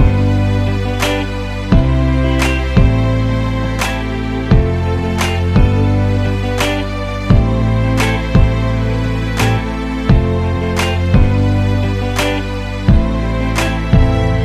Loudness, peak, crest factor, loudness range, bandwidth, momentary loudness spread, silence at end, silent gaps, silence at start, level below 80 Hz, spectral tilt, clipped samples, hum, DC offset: -15 LUFS; 0 dBFS; 14 dB; 1 LU; 14.5 kHz; 5 LU; 0 s; none; 0 s; -18 dBFS; -6.5 dB/octave; under 0.1%; none; under 0.1%